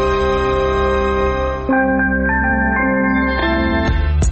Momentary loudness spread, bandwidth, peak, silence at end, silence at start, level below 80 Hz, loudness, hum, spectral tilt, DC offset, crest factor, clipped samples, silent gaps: 2 LU; 8 kHz; -6 dBFS; 0 s; 0 s; -22 dBFS; -16 LUFS; none; -5 dB/octave; under 0.1%; 8 dB; under 0.1%; none